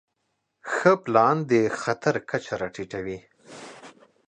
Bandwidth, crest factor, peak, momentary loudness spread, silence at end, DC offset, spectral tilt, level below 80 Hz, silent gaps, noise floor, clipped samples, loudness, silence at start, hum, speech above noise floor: 9.8 kHz; 22 dB; -4 dBFS; 22 LU; 0.4 s; under 0.1%; -6 dB/octave; -62 dBFS; none; -76 dBFS; under 0.1%; -24 LUFS; 0.65 s; none; 53 dB